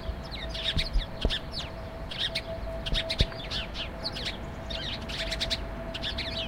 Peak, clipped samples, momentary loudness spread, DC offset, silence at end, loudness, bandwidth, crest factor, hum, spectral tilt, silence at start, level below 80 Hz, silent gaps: -8 dBFS; under 0.1%; 8 LU; under 0.1%; 0 s; -32 LUFS; 16 kHz; 24 dB; none; -4 dB/octave; 0 s; -36 dBFS; none